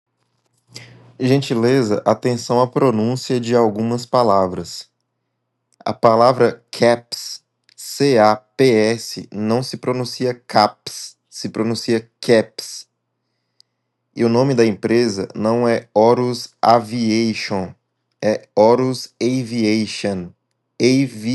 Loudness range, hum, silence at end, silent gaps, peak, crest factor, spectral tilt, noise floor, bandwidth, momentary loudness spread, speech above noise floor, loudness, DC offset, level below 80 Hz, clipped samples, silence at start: 4 LU; none; 0 s; none; 0 dBFS; 18 dB; -5.5 dB/octave; -73 dBFS; 12.5 kHz; 14 LU; 56 dB; -17 LUFS; under 0.1%; -70 dBFS; under 0.1%; 0.75 s